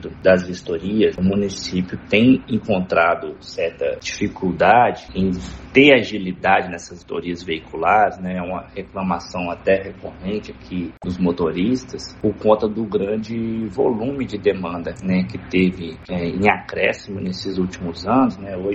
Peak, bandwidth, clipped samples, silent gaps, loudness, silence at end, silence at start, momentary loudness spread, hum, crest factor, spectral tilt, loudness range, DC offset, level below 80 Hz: 0 dBFS; 8 kHz; under 0.1%; none; -20 LUFS; 0 s; 0 s; 12 LU; none; 20 dB; -6 dB/octave; 5 LU; under 0.1%; -46 dBFS